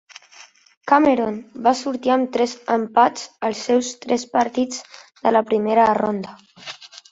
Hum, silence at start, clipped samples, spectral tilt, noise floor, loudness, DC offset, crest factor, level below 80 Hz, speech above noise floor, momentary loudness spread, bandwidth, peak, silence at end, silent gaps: none; 0.4 s; under 0.1%; -4 dB/octave; -48 dBFS; -20 LUFS; under 0.1%; 18 dB; -62 dBFS; 29 dB; 19 LU; 8 kHz; -2 dBFS; 0.15 s; 0.77-0.81 s